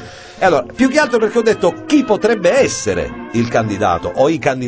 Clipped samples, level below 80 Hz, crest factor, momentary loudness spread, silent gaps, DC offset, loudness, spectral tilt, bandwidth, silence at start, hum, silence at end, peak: under 0.1%; -42 dBFS; 14 dB; 6 LU; none; under 0.1%; -15 LUFS; -5 dB/octave; 8 kHz; 0 s; none; 0 s; 0 dBFS